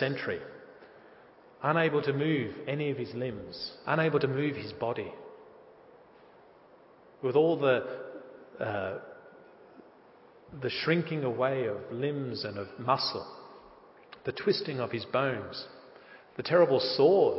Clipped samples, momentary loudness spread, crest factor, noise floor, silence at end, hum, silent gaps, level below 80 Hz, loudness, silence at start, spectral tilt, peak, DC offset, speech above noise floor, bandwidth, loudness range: under 0.1%; 21 LU; 20 dB; -57 dBFS; 0 s; none; none; -68 dBFS; -30 LUFS; 0 s; -9.5 dB/octave; -12 dBFS; under 0.1%; 28 dB; 5.8 kHz; 4 LU